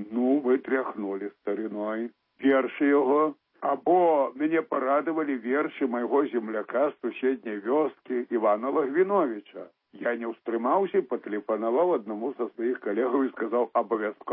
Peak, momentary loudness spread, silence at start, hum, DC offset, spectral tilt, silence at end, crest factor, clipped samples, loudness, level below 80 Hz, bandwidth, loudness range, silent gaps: -10 dBFS; 9 LU; 0 s; none; under 0.1%; -10 dB/octave; 0 s; 16 dB; under 0.1%; -27 LUFS; -86 dBFS; 3.8 kHz; 3 LU; none